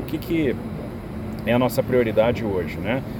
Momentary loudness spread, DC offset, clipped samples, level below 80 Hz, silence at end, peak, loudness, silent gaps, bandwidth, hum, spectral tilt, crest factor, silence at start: 12 LU; under 0.1%; under 0.1%; -42 dBFS; 0 s; -6 dBFS; -23 LUFS; none; 17.5 kHz; none; -7 dB/octave; 16 dB; 0 s